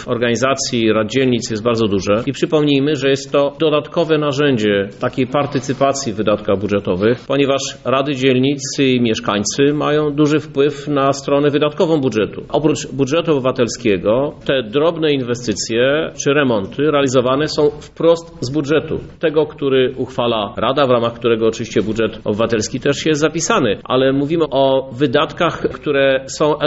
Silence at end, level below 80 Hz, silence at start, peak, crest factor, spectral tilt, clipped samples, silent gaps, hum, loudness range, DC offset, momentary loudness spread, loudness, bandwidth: 0 s; -46 dBFS; 0 s; -2 dBFS; 14 dB; -4.5 dB/octave; under 0.1%; none; none; 1 LU; under 0.1%; 4 LU; -16 LUFS; 8 kHz